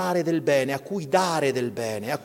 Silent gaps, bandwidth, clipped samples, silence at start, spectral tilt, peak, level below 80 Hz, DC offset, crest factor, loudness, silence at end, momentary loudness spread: none; 17 kHz; under 0.1%; 0 s; -5 dB/octave; -6 dBFS; -68 dBFS; under 0.1%; 18 dB; -24 LUFS; 0 s; 7 LU